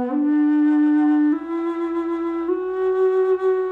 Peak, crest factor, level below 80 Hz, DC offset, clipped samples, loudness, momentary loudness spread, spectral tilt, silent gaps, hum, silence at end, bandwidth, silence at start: -12 dBFS; 8 dB; -62 dBFS; under 0.1%; under 0.1%; -20 LUFS; 7 LU; -7 dB/octave; none; none; 0 s; 4 kHz; 0 s